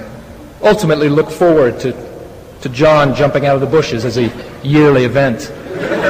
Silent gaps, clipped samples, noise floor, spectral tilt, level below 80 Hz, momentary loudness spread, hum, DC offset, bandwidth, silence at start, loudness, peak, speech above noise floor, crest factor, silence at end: none; under 0.1%; -32 dBFS; -6.5 dB/octave; -40 dBFS; 16 LU; none; under 0.1%; 15.5 kHz; 0 s; -12 LUFS; 0 dBFS; 21 dB; 12 dB; 0 s